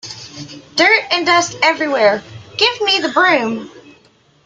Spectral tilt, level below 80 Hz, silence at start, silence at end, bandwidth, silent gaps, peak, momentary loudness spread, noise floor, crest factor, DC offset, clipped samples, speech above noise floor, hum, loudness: -2 dB/octave; -60 dBFS; 0.05 s; 0.65 s; 9.4 kHz; none; 0 dBFS; 18 LU; -52 dBFS; 16 dB; under 0.1%; under 0.1%; 37 dB; none; -14 LUFS